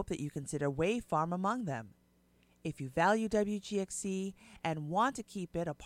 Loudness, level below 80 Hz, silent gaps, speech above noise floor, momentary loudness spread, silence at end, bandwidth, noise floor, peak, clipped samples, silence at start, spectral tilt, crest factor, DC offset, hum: -35 LUFS; -60 dBFS; none; 34 dB; 11 LU; 0 s; 15.5 kHz; -69 dBFS; -16 dBFS; under 0.1%; 0 s; -5.5 dB/octave; 20 dB; under 0.1%; 60 Hz at -65 dBFS